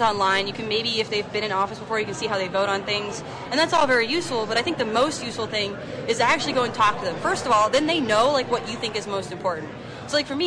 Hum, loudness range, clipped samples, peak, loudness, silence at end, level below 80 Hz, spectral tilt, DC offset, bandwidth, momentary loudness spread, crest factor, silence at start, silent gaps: none; 2 LU; under 0.1%; -10 dBFS; -23 LUFS; 0 s; -56 dBFS; -3.5 dB/octave; under 0.1%; 10.5 kHz; 8 LU; 14 dB; 0 s; none